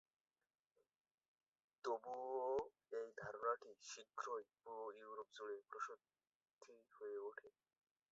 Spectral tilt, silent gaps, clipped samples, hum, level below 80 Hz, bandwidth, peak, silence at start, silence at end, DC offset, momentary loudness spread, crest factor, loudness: -2 dB/octave; 6.35-6.40 s, 6.53-6.59 s; under 0.1%; none; -88 dBFS; 7.6 kHz; -30 dBFS; 1.85 s; 0.6 s; under 0.1%; 14 LU; 22 dB; -50 LUFS